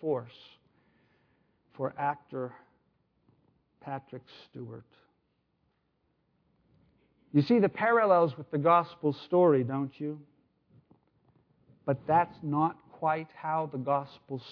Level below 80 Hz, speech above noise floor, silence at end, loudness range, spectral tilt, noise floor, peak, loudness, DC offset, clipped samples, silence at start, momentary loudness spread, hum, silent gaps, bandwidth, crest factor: -74 dBFS; 47 dB; 0 s; 21 LU; -9.5 dB/octave; -76 dBFS; -10 dBFS; -29 LUFS; under 0.1%; under 0.1%; 0 s; 21 LU; none; none; 5.4 kHz; 20 dB